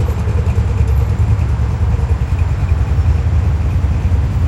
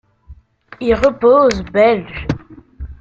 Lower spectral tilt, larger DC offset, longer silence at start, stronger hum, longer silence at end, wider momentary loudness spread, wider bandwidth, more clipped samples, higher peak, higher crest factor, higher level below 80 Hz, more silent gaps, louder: first, -8 dB/octave vs -6.5 dB/octave; neither; second, 0 s vs 0.3 s; neither; about the same, 0 s vs 0.05 s; second, 2 LU vs 15 LU; about the same, 8.2 kHz vs 7.6 kHz; neither; about the same, -2 dBFS vs -2 dBFS; about the same, 12 dB vs 14 dB; first, -16 dBFS vs -36 dBFS; neither; about the same, -16 LUFS vs -14 LUFS